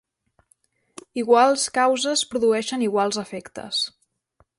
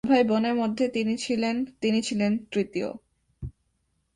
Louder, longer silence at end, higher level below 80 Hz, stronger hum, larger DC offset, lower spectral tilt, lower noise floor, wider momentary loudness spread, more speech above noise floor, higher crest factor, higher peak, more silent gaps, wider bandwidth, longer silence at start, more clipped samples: first, -21 LUFS vs -26 LUFS; about the same, 0.7 s vs 0.65 s; second, -66 dBFS vs -54 dBFS; neither; neither; second, -2.5 dB/octave vs -5.5 dB/octave; second, -65 dBFS vs -73 dBFS; second, 12 LU vs 19 LU; second, 44 dB vs 48 dB; about the same, 18 dB vs 18 dB; first, -4 dBFS vs -8 dBFS; neither; about the same, 11.5 kHz vs 11 kHz; first, 1.15 s vs 0.05 s; neither